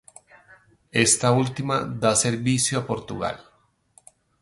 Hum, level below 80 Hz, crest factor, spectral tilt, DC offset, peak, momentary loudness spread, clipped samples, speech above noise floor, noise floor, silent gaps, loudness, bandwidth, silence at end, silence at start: none; -56 dBFS; 22 dB; -3.5 dB/octave; under 0.1%; -2 dBFS; 12 LU; under 0.1%; 37 dB; -59 dBFS; none; -22 LUFS; 11.5 kHz; 1 s; 0.95 s